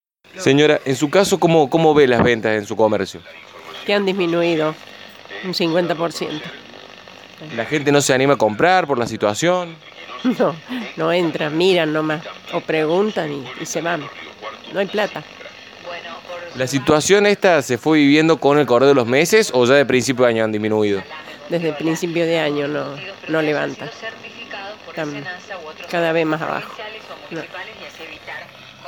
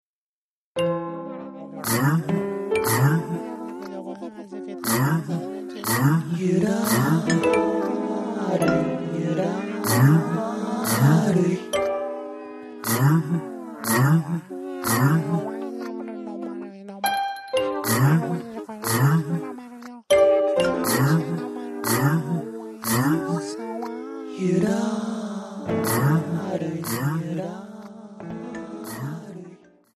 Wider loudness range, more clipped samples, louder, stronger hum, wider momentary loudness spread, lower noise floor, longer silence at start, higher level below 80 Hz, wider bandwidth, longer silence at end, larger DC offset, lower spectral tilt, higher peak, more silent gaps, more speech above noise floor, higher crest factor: first, 10 LU vs 4 LU; neither; first, -17 LUFS vs -23 LUFS; neither; first, 19 LU vs 16 LU; second, -40 dBFS vs under -90 dBFS; second, 0.35 s vs 0.75 s; about the same, -58 dBFS vs -60 dBFS; first, 19 kHz vs 13.5 kHz; second, 0 s vs 0.4 s; neither; second, -4.5 dB/octave vs -6 dB/octave; first, 0 dBFS vs -6 dBFS; neither; second, 23 dB vs over 69 dB; about the same, 18 dB vs 18 dB